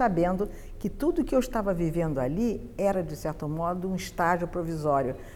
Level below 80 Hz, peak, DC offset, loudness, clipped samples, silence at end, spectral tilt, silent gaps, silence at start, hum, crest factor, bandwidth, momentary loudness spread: -42 dBFS; -10 dBFS; under 0.1%; -29 LUFS; under 0.1%; 0 s; -7 dB/octave; none; 0 s; none; 16 dB; 18 kHz; 6 LU